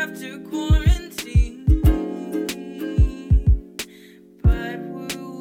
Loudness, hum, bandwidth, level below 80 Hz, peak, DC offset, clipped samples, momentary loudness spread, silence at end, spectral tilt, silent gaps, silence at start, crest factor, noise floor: -22 LUFS; none; 16 kHz; -22 dBFS; -6 dBFS; under 0.1%; under 0.1%; 12 LU; 0 s; -6.5 dB/octave; none; 0 s; 16 dB; -47 dBFS